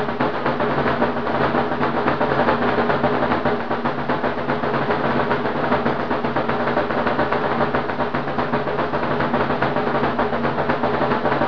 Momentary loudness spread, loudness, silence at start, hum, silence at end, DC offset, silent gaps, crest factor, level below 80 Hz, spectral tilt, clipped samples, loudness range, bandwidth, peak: 3 LU; -21 LUFS; 0 s; none; 0 s; 3%; none; 18 dB; -46 dBFS; -8 dB/octave; under 0.1%; 1 LU; 5.4 kHz; -2 dBFS